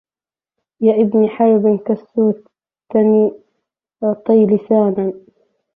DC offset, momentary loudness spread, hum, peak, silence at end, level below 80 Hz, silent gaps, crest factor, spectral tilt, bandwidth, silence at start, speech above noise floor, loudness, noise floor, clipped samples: under 0.1%; 8 LU; none; -2 dBFS; 0.55 s; -64 dBFS; none; 14 dB; -12.5 dB/octave; 3.5 kHz; 0.8 s; over 76 dB; -15 LUFS; under -90 dBFS; under 0.1%